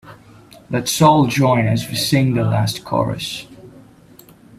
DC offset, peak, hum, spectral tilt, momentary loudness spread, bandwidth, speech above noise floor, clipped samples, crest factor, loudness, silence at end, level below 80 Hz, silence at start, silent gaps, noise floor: under 0.1%; 0 dBFS; none; -5.5 dB/octave; 12 LU; 16 kHz; 29 dB; under 0.1%; 18 dB; -17 LUFS; 0.9 s; -48 dBFS; 0.05 s; none; -46 dBFS